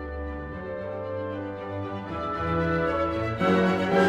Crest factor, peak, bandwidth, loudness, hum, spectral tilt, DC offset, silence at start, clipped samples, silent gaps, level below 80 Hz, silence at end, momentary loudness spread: 18 dB; -10 dBFS; 10.5 kHz; -28 LUFS; none; -7.5 dB/octave; under 0.1%; 0 s; under 0.1%; none; -44 dBFS; 0 s; 12 LU